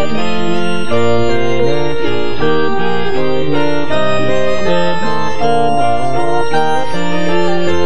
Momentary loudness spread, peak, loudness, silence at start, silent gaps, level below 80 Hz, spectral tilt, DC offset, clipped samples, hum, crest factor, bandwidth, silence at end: 3 LU; 0 dBFS; -16 LUFS; 0 s; none; -38 dBFS; -6 dB/octave; 30%; under 0.1%; none; 12 dB; 10 kHz; 0 s